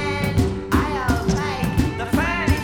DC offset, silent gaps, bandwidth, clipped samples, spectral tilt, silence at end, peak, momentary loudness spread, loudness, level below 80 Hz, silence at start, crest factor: 0.3%; none; 19.5 kHz; under 0.1%; -6 dB/octave; 0 s; -4 dBFS; 2 LU; -21 LUFS; -30 dBFS; 0 s; 16 dB